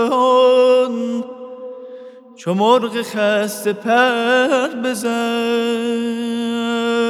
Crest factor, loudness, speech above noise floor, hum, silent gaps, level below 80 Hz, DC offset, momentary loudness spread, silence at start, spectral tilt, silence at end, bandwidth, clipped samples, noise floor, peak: 16 dB; -17 LUFS; 21 dB; none; none; -84 dBFS; under 0.1%; 19 LU; 0 s; -4.5 dB/octave; 0 s; 14.5 kHz; under 0.1%; -38 dBFS; 0 dBFS